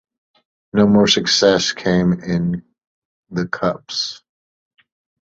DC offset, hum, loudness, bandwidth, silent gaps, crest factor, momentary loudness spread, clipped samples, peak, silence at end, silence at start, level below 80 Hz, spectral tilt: under 0.1%; none; -17 LUFS; 7.8 kHz; 2.87-3.23 s; 18 dB; 13 LU; under 0.1%; -2 dBFS; 1.05 s; 0.75 s; -48 dBFS; -4.5 dB/octave